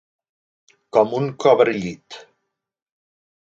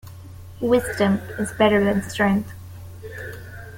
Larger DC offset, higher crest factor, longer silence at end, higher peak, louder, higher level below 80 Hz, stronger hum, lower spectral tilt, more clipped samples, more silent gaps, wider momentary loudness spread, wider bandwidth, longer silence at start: neither; about the same, 22 dB vs 18 dB; first, 1.25 s vs 0 s; about the same, -2 dBFS vs -4 dBFS; first, -18 LUFS vs -21 LUFS; second, -62 dBFS vs -48 dBFS; neither; about the same, -6 dB/octave vs -6 dB/octave; neither; neither; about the same, 23 LU vs 21 LU; second, 7.8 kHz vs 17 kHz; first, 0.95 s vs 0.05 s